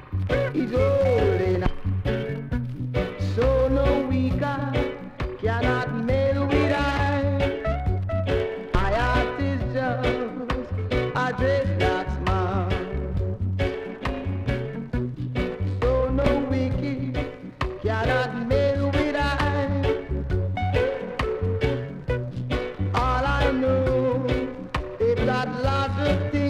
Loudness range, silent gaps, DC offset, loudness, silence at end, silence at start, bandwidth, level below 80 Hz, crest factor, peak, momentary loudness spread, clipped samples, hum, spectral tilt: 2 LU; none; under 0.1%; -25 LUFS; 0 s; 0 s; 9.4 kHz; -34 dBFS; 18 dB; -6 dBFS; 7 LU; under 0.1%; none; -7.5 dB/octave